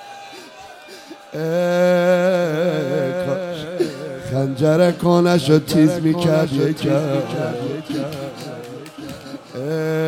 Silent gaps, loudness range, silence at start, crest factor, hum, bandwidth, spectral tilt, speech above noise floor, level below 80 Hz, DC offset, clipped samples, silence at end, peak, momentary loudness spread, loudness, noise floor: none; 6 LU; 0 s; 18 dB; none; 16.5 kHz; -6.5 dB/octave; 22 dB; -56 dBFS; under 0.1%; under 0.1%; 0 s; -2 dBFS; 20 LU; -19 LUFS; -39 dBFS